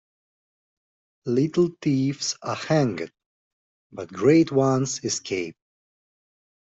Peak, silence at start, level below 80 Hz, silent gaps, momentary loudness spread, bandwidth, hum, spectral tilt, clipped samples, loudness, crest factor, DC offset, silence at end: -6 dBFS; 1.25 s; -64 dBFS; 3.26-3.90 s; 18 LU; 8.2 kHz; none; -5.5 dB/octave; under 0.1%; -23 LUFS; 20 dB; under 0.1%; 1.1 s